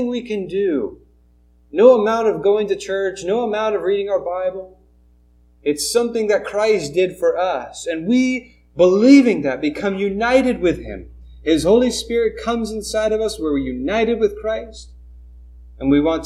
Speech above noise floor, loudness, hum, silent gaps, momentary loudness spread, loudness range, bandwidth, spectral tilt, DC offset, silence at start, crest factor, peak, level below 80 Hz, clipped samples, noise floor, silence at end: 36 dB; -18 LUFS; 60 Hz at -45 dBFS; none; 12 LU; 6 LU; 14.5 kHz; -5 dB/octave; under 0.1%; 0 s; 18 dB; 0 dBFS; -42 dBFS; under 0.1%; -53 dBFS; 0 s